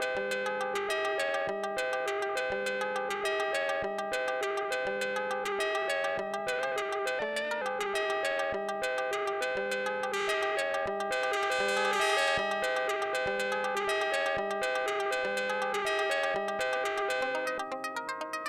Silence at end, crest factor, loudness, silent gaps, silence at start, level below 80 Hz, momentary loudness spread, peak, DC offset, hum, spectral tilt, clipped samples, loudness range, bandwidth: 0 s; 16 dB; -31 LUFS; none; 0 s; -68 dBFS; 4 LU; -16 dBFS; under 0.1%; none; -2 dB/octave; under 0.1%; 3 LU; 16.5 kHz